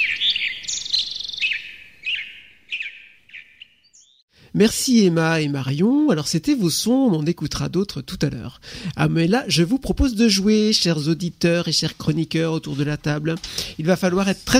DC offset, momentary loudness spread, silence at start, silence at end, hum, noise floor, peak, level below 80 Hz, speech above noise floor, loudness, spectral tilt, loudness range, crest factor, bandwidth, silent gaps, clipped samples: under 0.1%; 12 LU; 0 s; 0 s; none; -54 dBFS; -2 dBFS; -40 dBFS; 35 dB; -20 LUFS; -4.5 dB/octave; 7 LU; 18 dB; 16 kHz; 4.22-4.28 s; under 0.1%